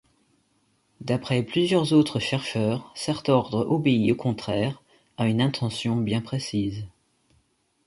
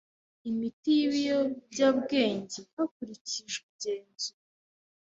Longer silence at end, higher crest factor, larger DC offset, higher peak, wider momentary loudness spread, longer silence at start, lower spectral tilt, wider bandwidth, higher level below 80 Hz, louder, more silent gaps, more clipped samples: about the same, 0.95 s vs 0.85 s; about the same, 20 dB vs 20 dB; neither; first, -6 dBFS vs -12 dBFS; about the same, 9 LU vs 11 LU; first, 1 s vs 0.45 s; first, -6.5 dB/octave vs -3.5 dB/octave; first, 11.5 kHz vs 8 kHz; first, -56 dBFS vs -72 dBFS; first, -25 LUFS vs -30 LUFS; second, none vs 0.73-0.83 s, 2.73-2.77 s, 2.91-3.00 s, 3.21-3.25 s, 3.63-3.79 s; neither